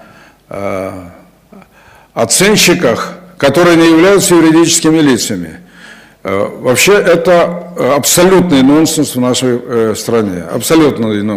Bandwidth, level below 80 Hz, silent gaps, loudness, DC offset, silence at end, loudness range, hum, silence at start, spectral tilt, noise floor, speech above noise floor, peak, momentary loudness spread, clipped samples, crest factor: 16 kHz; -42 dBFS; none; -9 LUFS; under 0.1%; 0 s; 3 LU; none; 0.5 s; -4 dB/octave; -42 dBFS; 33 dB; 0 dBFS; 13 LU; under 0.1%; 10 dB